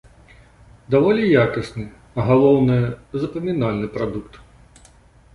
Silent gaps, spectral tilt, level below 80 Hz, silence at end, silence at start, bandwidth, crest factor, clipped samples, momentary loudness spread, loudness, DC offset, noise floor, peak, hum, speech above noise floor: none; -8.5 dB/octave; -46 dBFS; 1 s; 0.9 s; 11 kHz; 18 dB; under 0.1%; 14 LU; -19 LUFS; under 0.1%; -50 dBFS; -2 dBFS; none; 32 dB